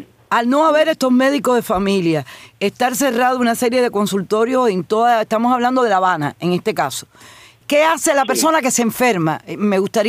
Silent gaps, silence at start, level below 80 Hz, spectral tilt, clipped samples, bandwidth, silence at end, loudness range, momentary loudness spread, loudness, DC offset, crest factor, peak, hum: none; 0 s; -54 dBFS; -4 dB/octave; under 0.1%; 16 kHz; 0 s; 1 LU; 6 LU; -16 LUFS; under 0.1%; 14 dB; -2 dBFS; none